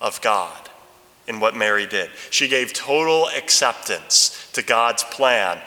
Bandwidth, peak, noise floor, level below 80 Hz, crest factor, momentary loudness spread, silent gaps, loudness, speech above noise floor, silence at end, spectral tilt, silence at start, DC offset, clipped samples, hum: 19.5 kHz; -2 dBFS; -50 dBFS; -70 dBFS; 18 dB; 10 LU; none; -18 LUFS; 30 dB; 0 s; 0 dB/octave; 0 s; under 0.1%; under 0.1%; none